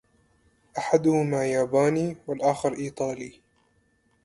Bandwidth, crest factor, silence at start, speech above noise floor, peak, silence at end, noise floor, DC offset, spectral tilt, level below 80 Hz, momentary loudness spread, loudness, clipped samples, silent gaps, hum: 11.5 kHz; 20 dB; 0.75 s; 42 dB; -6 dBFS; 0.95 s; -67 dBFS; under 0.1%; -6.5 dB/octave; -64 dBFS; 12 LU; -25 LUFS; under 0.1%; none; none